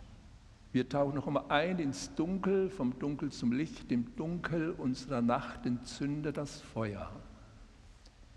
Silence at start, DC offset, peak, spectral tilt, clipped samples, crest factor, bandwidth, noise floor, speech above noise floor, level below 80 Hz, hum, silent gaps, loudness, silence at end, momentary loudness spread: 0 s; under 0.1%; -12 dBFS; -6.5 dB/octave; under 0.1%; 22 dB; 11 kHz; -57 dBFS; 22 dB; -56 dBFS; none; none; -35 LUFS; 0 s; 7 LU